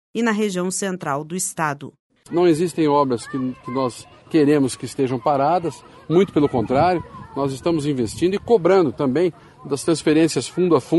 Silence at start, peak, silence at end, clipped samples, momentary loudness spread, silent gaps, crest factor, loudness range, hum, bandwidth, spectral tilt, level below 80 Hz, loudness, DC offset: 0.15 s; -4 dBFS; 0 s; under 0.1%; 9 LU; 2.00-2.10 s; 16 dB; 2 LU; none; 12 kHz; -5.5 dB/octave; -54 dBFS; -20 LUFS; under 0.1%